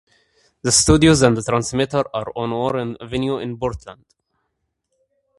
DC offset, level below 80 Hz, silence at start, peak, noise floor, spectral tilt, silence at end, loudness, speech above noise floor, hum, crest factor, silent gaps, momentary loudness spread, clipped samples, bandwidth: under 0.1%; -38 dBFS; 0.65 s; 0 dBFS; -74 dBFS; -4.5 dB/octave; 1.45 s; -18 LUFS; 56 dB; none; 20 dB; none; 13 LU; under 0.1%; 11.5 kHz